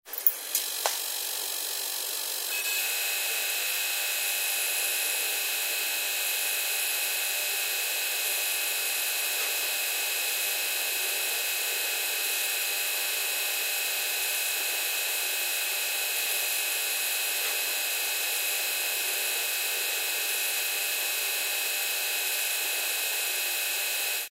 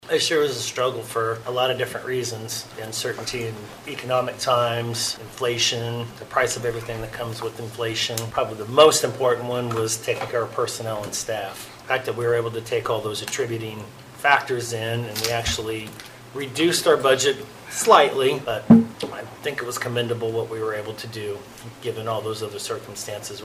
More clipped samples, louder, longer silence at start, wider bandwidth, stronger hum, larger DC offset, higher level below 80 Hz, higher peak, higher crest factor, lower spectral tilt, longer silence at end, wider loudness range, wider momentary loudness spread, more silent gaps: neither; second, -26 LUFS vs -23 LUFS; about the same, 0.05 s vs 0.05 s; about the same, 16.5 kHz vs 15.5 kHz; neither; neither; second, under -90 dBFS vs -54 dBFS; about the same, -4 dBFS vs -2 dBFS; first, 26 dB vs 20 dB; second, 5 dB/octave vs -3.5 dB/octave; about the same, 0.05 s vs 0 s; second, 0 LU vs 7 LU; second, 1 LU vs 15 LU; neither